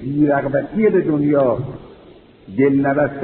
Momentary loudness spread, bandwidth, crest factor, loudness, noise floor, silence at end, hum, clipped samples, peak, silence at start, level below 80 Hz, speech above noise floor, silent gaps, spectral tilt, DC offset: 11 LU; 4.1 kHz; 14 dB; -17 LUFS; -44 dBFS; 0 s; none; under 0.1%; -4 dBFS; 0 s; -48 dBFS; 28 dB; none; -8.5 dB/octave; under 0.1%